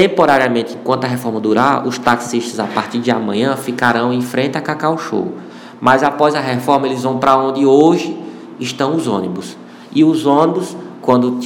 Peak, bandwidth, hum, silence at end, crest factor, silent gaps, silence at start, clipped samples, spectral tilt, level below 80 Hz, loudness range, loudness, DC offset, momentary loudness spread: 0 dBFS; 19.5 kHz; none; 0 s; 14 dB; none; 0 s; 0.3%; -5.5 dB/octave; -58 dBFS; 3 LU; -15 LUFS; under 0.1%; 13 LU